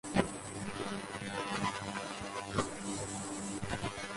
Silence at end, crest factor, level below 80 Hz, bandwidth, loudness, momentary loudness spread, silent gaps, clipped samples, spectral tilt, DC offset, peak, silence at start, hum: 0 s; 22 dB; -56 dBFS; 11.5 kHz; -38 LUFS; 5 LU; none; under 0.1%; -4 dB/octave; under 0.1%; -16 dBFS; 0.05 s; none